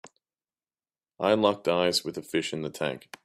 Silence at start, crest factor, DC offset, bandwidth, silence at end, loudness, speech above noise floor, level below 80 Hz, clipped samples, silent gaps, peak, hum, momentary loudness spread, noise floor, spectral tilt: 0.05 s; 22 dB; under 0.1%; 15.5 kHz; 0.25 s; -27 LUFS; over 63 dB; -70 dBFS; under 0.1%; none; -8 dBFS; none; 9 LU; under -90 dBFS; -4 dB/octave